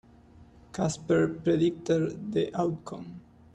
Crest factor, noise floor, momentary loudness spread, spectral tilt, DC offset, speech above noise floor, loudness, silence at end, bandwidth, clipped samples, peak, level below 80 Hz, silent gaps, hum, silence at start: 16 dB; -54 dBFS; 16 LU; -6.5 dB/octave; under 0.1%; 26 dB; -28 LUFS; 0.35 s; 10.5 kHz; under 0.1%; -14 dBFS; -60 dBFS; none; none; 0.4 s